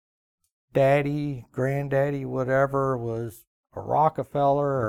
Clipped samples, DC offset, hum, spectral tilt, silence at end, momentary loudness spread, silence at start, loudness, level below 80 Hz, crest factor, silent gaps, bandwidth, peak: under 0.1%; under 0.1%; none; -8 dB/octave; 0 s; 11 LU; 0.75 s; -25 LUFS; -54 dBFS; 16 dB; 3.47-3.64 s; 15 kHz; -8 dBFS